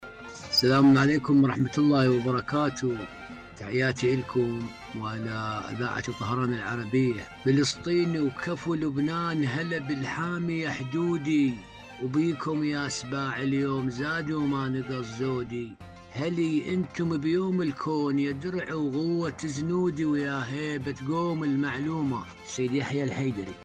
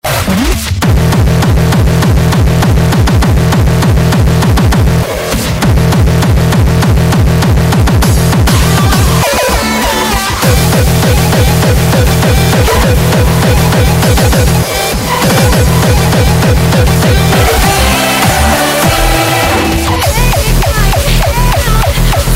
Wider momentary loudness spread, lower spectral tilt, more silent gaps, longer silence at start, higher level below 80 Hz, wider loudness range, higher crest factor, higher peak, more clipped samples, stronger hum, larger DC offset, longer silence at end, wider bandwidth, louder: first, 10 LU vs 2 LU; about the same, -6 dB/octave vs -5 dB/octave; neither; about the same, 0 s vs 0.05 s; second, -58 dBFS vs -14 dBFS; first, 4 LU vs 1 LU; first, 14 dB vs 8 dB; second, -12 dBFS vs 0 dBFS; neither; neither; neither; about the same, 0 s vs 0 s; second, 14.5 kHz vs 16.5 kHz; second, -28 LUFS vs -9 LUFS